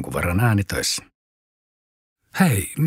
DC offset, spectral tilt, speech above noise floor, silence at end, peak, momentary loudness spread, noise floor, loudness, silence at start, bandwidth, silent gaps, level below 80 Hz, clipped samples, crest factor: under 0.1%; -5 dB/octave; over 70 dB; 0 s; -4 dBFS; 7 LU; under -90 dBFS; -21 LUFS; 0 s; 16 kHz; 1.15-2.16 s; -44 dBFS; under 0.1%; 20 dB